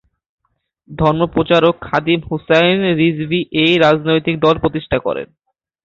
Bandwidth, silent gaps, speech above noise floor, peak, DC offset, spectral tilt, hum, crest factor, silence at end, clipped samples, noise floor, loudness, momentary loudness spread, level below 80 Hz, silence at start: 7.4 kHz; none; 44 dB; 0 dBFS; under 0.1%; -7 dB/octave; none; 16 dB; 0.6 s; under 0.1%; -59 dBFS; -15 LUFS; 7 LU; -42 dBFS; 0.9 s